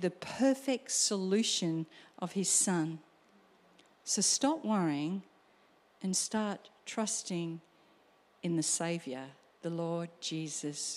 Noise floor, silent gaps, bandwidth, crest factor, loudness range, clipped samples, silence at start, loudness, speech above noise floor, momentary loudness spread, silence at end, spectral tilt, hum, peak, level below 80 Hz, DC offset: -66 dBFS; none; 15.5 kHz; 20 dB; 6 LU; under 0.1%; 0 s; -33 LUFS; 33 dB; 15 LU; 0 s; -3.5 dB/octave; none; -16 dBFS; -84 dBFS; under 0.1%